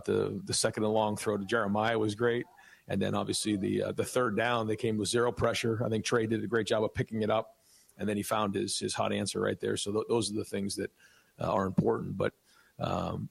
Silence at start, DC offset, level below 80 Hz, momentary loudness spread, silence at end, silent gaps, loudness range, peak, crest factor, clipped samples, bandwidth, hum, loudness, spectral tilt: 0 s; under 0.1%; -62 dBFS; 6 LU; 0.05 s; none; 3 LU; -16 dBFS; 16 dB; under 0.1%; 15.5 kHz; none; -31 LUFS; -4.5 dB/octave